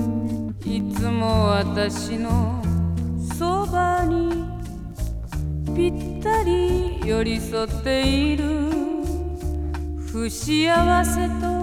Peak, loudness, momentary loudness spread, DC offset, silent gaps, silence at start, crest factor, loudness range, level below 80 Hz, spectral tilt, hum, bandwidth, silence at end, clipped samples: -4 dBFS; -23 LUFS; 9 LU; under 0.1%; none; 0 s; 18 dB; 2 LU; -30 dBFS; -6 dB/octave; none; 16 kHz; 0 s; under 0.1%